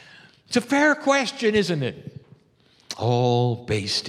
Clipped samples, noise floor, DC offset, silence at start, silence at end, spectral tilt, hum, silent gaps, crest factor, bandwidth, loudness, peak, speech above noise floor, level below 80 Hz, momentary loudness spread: under 0.1%; -59 dBFS; under 0.1%; 0.5 s; 0 s; -5 dB/octave; none; none; 16 dB; 13.5 kHz; -22 LUFS; -6 dBFS; 37 dB; -58 dBFS; 12 LU